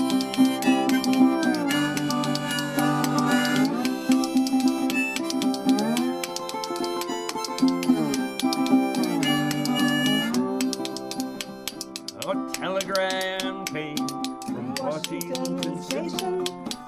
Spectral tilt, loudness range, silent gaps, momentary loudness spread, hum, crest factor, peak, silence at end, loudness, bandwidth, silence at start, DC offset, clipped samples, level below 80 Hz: -4 dB/octave; 6 LU; none; 9 LU; none; 18 dB; -6 dBFS; 0 s; -25 LUFS; 15.5 kHz; 0 s; under 0.1%; under 0.1%; -64 dBFS